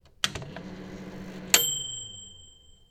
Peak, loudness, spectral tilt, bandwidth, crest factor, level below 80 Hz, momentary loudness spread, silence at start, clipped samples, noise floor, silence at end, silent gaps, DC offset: 0 dBFS; -25 LUFS; -0.5 dB/octave; 19 kHz; 32 dB; -56 dBFS; 20 LU; 0.05 s; under 0.1%; -54 dBFS; 0.35 s; none; under 0.1%